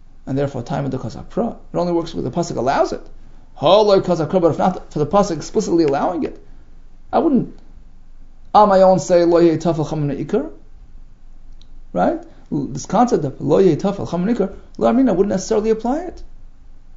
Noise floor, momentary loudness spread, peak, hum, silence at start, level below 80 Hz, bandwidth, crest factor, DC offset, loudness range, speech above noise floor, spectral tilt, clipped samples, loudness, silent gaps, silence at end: -37 dBFS; 12 LU; 0 dBFS; none; 0.15 s; -38 dBFS; 7.8 kHz; 18 dB; under 0.1%; 6 LU; 21 dB; -6.5 dB/octave; under 0.1%; -18 LUFS; none; 0 s